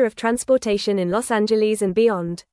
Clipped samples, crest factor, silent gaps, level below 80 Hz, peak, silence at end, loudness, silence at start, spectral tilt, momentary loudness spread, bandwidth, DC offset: under 0.1%; 12 dB; none; -54 dBFS; -6 dBFS; 0.1 s; -20 LUFS; 0 s; -5 dB/octave; 3 LU; 12 kHz; under 0.1%